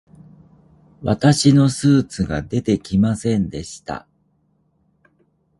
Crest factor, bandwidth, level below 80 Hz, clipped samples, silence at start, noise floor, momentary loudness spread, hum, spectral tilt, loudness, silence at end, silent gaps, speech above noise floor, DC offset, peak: 18 dB; 11.5 kHz; -44 dBFS; under 0.1%; 1 s; -63 dBFS; 17 LU; none; -6 dB/octave; -18 LUFS; 1.6 s; none; 46 dB; under 0.1%; -2 dBFS